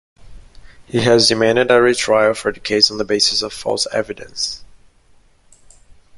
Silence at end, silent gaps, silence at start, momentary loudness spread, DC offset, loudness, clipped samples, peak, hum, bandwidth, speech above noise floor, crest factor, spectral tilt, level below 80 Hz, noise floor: 1.5 s; none; 0.25 s; 11 LU; under 0.1%; -15 LUFS; under 0.1%; 0 dBFS; none; 11.5 kHz; 35 dB; 18 dB; -3 dB/octave; -48 dBFS; -51 dBFS